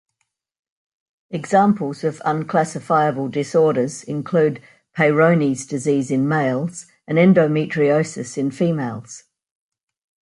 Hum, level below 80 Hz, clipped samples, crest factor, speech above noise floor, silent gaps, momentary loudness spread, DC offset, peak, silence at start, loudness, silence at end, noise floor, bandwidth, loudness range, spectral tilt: none; -64 dBFS; under 0.1%; 18 dB; 56 dB; none; 14 LU; under 0.1%; -2 dBFS; 1.3 s; -19 LUFS; 1.05 s; -74 dBFS; 11.5 kHz; 2 LU; -6.5 dB/octave